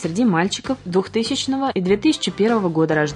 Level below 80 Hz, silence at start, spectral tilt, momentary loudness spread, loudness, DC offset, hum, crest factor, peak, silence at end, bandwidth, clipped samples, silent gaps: -52 dBFS; 0 s; -5 dB/octave; 4 LU; -20 LUFS; under 0.1%; none; 14 dB; -4 dBFS; 0 s; 10.5 kHz; under 0.1%; none